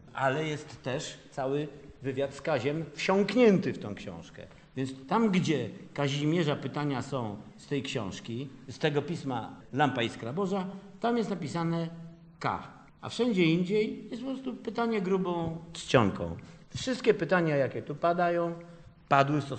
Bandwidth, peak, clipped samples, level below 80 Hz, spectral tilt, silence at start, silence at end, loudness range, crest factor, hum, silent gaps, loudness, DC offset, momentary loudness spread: 8.8 kHz; -8 dBFS; under 0.1%; -62 dBFS; -6 dB/octave; 0.05 s; 0 s; 4 LU; 22 dB; none; none; -30 LUFS; under 0.1%; 14 LU